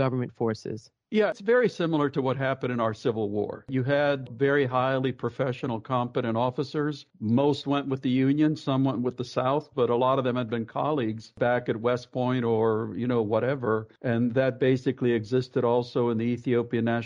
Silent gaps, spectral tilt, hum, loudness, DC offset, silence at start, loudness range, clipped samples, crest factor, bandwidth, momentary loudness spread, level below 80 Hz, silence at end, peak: none; -8 dB/octave; none; -27 LUFS; under 0.1%; 0 s; 1 LU; under 0.1%; 14 dB; 7.6 kHz; 6 LU; -66 dBFS; 0 s; -12 dBFS